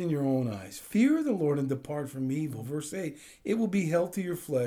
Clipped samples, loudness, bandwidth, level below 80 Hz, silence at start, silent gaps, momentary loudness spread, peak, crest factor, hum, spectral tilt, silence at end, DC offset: under 0.1%; -30 LUFS; over 20 kHz; -68 dBFS; 0 s; none; 11 LU; -14 dBFS; 14 dB; none; -7 dB/octave; 0 s; under 0.1%